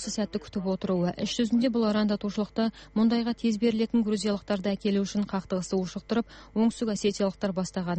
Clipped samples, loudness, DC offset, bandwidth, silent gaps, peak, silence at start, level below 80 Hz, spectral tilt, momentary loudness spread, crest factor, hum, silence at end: under 0.1%; -28 LUFS; under 0.1%; 8.4 kHz; none; -14 dBFS; 0 s; -56 dBFS; -5.5 dB/octave; 6 LU; 14 dB; none; 0 s